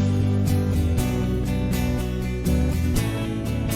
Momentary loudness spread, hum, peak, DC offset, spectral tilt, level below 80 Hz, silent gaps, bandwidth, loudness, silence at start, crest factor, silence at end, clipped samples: 4 LU; none; -10 dBFS; under 0.1%; -6.5 dB/octave; -30 dBFS; none; 17 kHz; -24 LUFS; 0 s; 12 dB; 0 s; under 0.1%